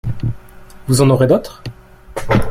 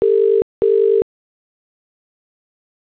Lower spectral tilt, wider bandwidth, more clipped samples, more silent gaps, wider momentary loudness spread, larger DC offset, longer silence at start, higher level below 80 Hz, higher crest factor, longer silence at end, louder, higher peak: second, -6.5 dB/octave vs -11 dB/octave; first, 16 kHz vs 4 kHz; neither; second, none vs 0.42-0.62 s; first, 21 LU vs 5 LU; neither; about the same, 0.05 s vs 0 s; first, -32 dBFS vs -54 dBFS; about the same, 16 dB vs 12 dB; second, 0 s vs 1.95 s; about the same, -15 LUFS vs -16 LUFS; first, -2 dBFS vs -8 dBFS